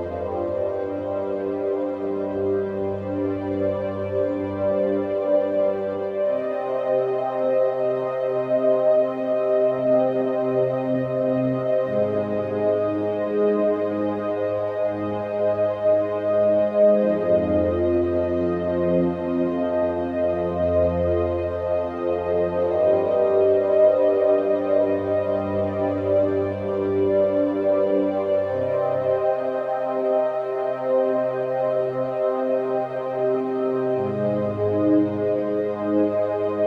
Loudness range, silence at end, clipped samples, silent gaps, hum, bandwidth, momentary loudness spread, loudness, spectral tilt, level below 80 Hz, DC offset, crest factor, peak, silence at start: 4 LU; 0 s; under 0.1%; none; none; 5.2 kHz; 6 LU; -22 LUFS; -9.5 dB/octave; -52 dBFS; under 0.1%; 14 dB; -8 dBFS; 0 s